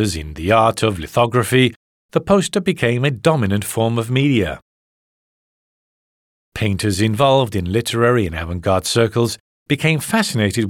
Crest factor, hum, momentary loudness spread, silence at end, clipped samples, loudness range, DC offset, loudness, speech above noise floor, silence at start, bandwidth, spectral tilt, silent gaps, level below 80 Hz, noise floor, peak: 16 dB; none; 8 LU; 0 s; under 0.1%; 5 LU; under 0.1%; -17 LUFS; over 73 dB; 0 s; 17.5 kHz; -5.5 dB/octave; 1.76-2.09 s, 4.62-6.52 s, 9.40-9.66 s; -44 dBFS; under -90 dBFS; -2 dBFS